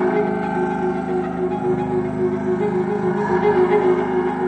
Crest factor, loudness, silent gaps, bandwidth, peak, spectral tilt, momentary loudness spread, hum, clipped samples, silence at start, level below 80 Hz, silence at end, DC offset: 12 dB; -20 LUFS; none; 8.6 kHz; -6 dBFS; -8.5 dB/octave; 6 LU; none; under 0.1%; 0 s; -46 dBFS; 0 s; under 0.1%